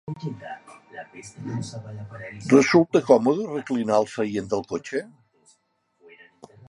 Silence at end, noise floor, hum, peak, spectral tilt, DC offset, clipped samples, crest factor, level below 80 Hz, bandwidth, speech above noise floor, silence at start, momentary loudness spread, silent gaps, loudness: 1.6 s; -68 dBFS; none; -2 dBFS; -6 dB/octave; under 0.1%; under 0.1%; 22 dB; -64 dBFS; 11 kHz; 45 dB; 0.1 s; 22 LU; none; -22 LUFS